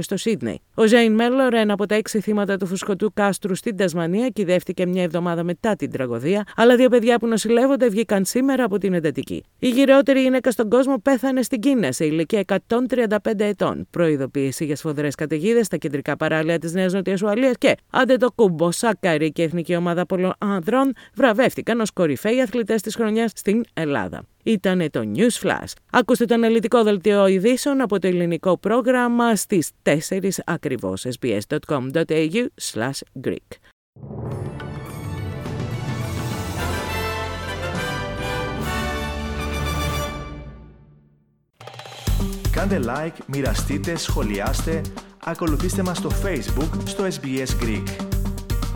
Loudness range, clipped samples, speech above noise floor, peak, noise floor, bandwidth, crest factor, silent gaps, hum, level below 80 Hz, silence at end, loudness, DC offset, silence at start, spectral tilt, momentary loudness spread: 9 LU; under 0.1%; 41 dB; -2 dBFS; -61 dBFS; 19 kHz; 18 dB; 33.73-33.93 s; none; -36 dBFS; 0 s; -21 LUFS; under 0.1%; 0 s; -5.5 dB/octave; 10 LU